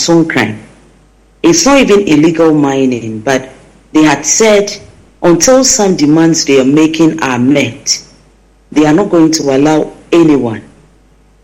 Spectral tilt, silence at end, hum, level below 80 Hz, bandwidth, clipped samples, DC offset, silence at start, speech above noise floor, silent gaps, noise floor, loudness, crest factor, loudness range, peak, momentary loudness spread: -4 dB/octave; 0.85 s; none; -42 dBFS; 16.5 kHz; under 0.1%; under 0.1%; 0 s; 37 dB; none; -45 dBFS; -9 LUFS; 10 dB; 3 LU; 0 dBFS; 9 LU